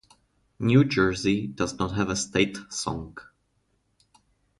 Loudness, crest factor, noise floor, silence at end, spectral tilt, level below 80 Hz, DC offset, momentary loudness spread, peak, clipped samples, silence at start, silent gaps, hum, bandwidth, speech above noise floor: -25 LUFS; 20 dB; -71 dBFS; 1.4 s; -5 dB/octave; -50 dBFS; under 0.1%; 12 LU; -8 dBFS; under 0.1%; 0.6 s; none; none; 11.5 kHz; 46 dB